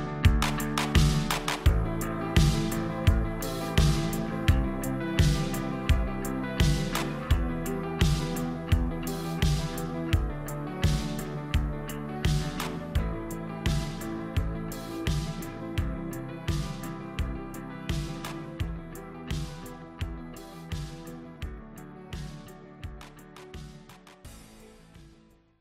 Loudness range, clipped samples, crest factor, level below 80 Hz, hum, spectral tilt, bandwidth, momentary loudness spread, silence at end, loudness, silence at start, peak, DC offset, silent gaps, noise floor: 15 LU; under 0.1%; 18 dB; -34 dBFS; none; -5.5 dB/octave; 16 kHz; 18 LU; 0.5 s; -30 LUFS; 0 s; -10 dBFS; under 0.1%; none; -58 dBFS